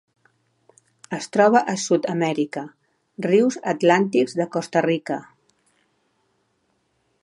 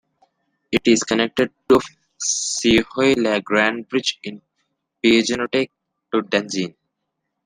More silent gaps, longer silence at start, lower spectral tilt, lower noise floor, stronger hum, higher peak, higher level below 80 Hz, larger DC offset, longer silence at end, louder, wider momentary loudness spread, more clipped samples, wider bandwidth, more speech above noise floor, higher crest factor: neither; first, 1.1 s vs 0.7 s; first, -5 dB/octave vs -3 dB/octave; second, -69 dBFS vs -77 dBFS; neither; about the same, -4 dBFS vs -2 dBFS; second, -76 dBFS vs -52 dBFS; neither; first, 2 s vs 0.75 s; about the same, -21 LUFS vs -19 LUFS; first, 14 LU vs 9 LU; neither; second, 11.5 kHz vs 13.5 kHz; second, 49 dB vs 58 dB; about the same, 20 dB vs 20 dB